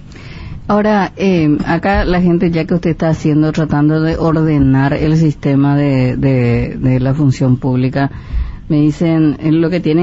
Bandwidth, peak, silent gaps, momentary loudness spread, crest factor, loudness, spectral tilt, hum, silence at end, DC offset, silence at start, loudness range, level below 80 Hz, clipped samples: 7.8 kHz; -2 dBFS; none; 5 LU; 12 dB; -13 LUFS; -8.5 dB/octave; none; 0 s; under 0.1%; 0.05 s; 2 LU; -28 dBFS; under 0.1%